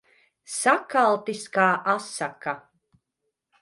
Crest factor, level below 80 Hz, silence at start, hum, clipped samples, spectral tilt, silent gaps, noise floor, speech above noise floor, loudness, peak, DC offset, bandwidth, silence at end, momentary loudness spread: 20 dB; -78 dBFS; 0.5 s; none; under 0.1%; -3.5 dB/octave; none; -81 dBFS; 57 dB; -24 LUFS; -6 dBFS; under 0.1%; 11.5 kHz; 1 s; 12 LU